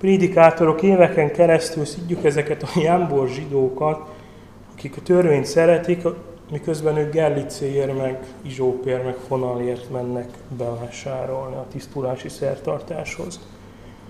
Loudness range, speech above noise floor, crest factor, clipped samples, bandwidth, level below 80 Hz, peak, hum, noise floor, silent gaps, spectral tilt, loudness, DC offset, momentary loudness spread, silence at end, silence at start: 9 LU; 23 dB; 20 dB; under 0.1%; 13.5 kHz; -50 dBFS; 0 dBFS; none; -43 dBFS; none; -6.5 dB/octave; -20 LUFS; 0.1%; 16 LU; 0 s; 0 s